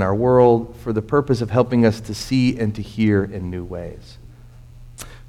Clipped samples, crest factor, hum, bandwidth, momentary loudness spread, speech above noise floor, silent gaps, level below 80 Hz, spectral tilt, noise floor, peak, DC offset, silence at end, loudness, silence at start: under 0.1%; 18 dB; none; 15 kHz; 17 LU; 23 dB; none; -42 dBFS; -7.5 dB/octave; -42 dBFS; -2 dBFS; under 0.1%; 0 s; -19 LUFS; 0 s